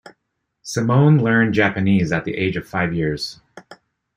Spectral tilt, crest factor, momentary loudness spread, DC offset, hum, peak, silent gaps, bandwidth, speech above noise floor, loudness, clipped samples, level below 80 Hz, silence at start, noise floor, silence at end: -6.5 dB/octave; 18 dB; 13 LU; under 0.1%; none; -2 dBFS; none; 11.5 kHz; 57 dB; -18 LUFS; under 0.1%; -50 dBFS; 0.65 s; -75 dBFS; 0.45 s